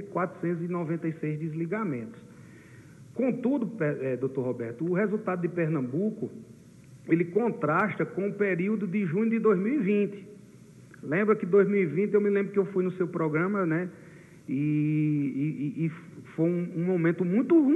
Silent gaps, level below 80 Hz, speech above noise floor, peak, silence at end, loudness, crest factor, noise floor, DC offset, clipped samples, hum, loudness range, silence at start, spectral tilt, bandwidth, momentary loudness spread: none; -74 dBFS; 24 dB; -10 dBFS; 0 s; -28 LUFS; 18 dB; -51 dBFS; under 0.1%; under 0.1%; none; 5 LU; 0 s; -9.5 dB/octave; 10 kHz; 8 LU